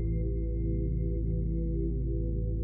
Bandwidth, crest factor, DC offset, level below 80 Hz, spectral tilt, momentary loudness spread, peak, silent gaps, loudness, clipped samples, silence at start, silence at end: 2.2 kHz; 10 dB; under 0.1%; -32 dBFS; -15.5 dB/octave; 1 LU; -20 dBFS; none; -32 LUFS; under 0.1%; 0 s; 0 s